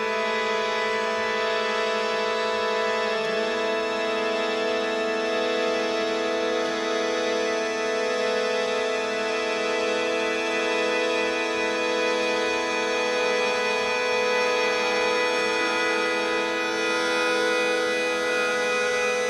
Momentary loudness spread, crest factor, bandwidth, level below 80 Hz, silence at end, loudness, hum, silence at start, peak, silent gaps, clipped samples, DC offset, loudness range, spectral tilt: 3 LU; 12 dB; 13 kHz; -62 dBFS; 0 s; -24 LUFS; none; 0 s; -12 dBFS; none; under 0.1%; under 0.1%; 2 LU; -2 dB/octave